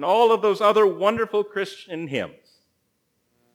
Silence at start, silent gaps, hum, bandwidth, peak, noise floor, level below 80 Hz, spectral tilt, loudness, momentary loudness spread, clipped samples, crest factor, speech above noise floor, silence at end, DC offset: 0 s; none; none; 16.5 kHz; -6 dBFS; -71 dBFS; -70 dBFS; -5 dB/octave; -21 LUFS; 13 LU; under 0.1%; 18 dB; 51 dB; 1.25 s; under 0.1%